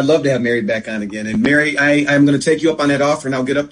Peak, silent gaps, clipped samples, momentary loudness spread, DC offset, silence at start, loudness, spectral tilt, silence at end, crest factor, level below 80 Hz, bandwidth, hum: -2 dBFS; none; under 0.1%; 8 LU; under 0.1%; 0 s; -15 LUFS; -5.5 dB/octave; 0.05 s; 14 dB; -50 dBFS; 10.5 kHz; none